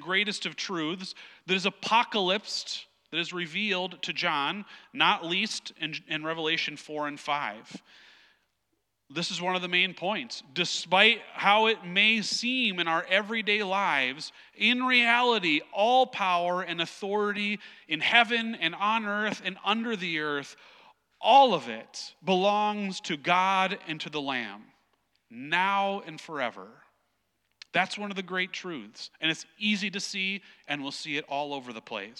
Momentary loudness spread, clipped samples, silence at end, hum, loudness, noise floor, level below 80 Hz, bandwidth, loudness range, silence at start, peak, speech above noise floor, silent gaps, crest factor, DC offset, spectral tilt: 14 LU; under 0.1%; 0.05 s; none; -27 LUFS; -78 dBFS; -86 dBFS; 12 kHz; 8 LU; 0 s; -6 dBFS; 50 dB; none; 24 dB; under 0.1%; -3 dB/octave